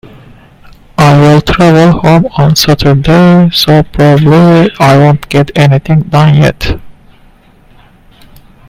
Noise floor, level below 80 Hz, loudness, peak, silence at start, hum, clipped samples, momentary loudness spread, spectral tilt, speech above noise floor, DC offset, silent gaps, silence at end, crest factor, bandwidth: -40 dBFS; -28 dBFS; -6 LUFS; 0 dBFS; 1 s; none; 1%; 5 LU; -6.5 dB/octave; 35 dB; under 0.1%; none; 1.75 s; 6 dB; 16 kHz